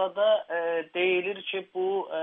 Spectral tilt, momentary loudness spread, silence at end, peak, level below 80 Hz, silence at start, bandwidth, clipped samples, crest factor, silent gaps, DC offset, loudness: -7.5 dB/octave; 7 LU; 0 s; -14 dBFS; -86 dBFS; 0 s; 3.9 kHz; under 0.1%; 14 dB; none; under 0.1%; -28 LUFS